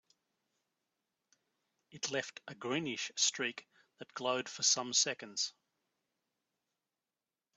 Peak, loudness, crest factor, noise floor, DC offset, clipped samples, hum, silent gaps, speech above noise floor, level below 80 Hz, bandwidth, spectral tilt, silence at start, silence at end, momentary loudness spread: -16 dBFS; -34 LUFS; 24 dB; under -90 dBFS; under 0.1%; under 0.1%; none; none; over 53 dB; -86 dBFS; 8.2 kHz; -1 dB/octave; 1.95 s; 2.05 s; 13 LU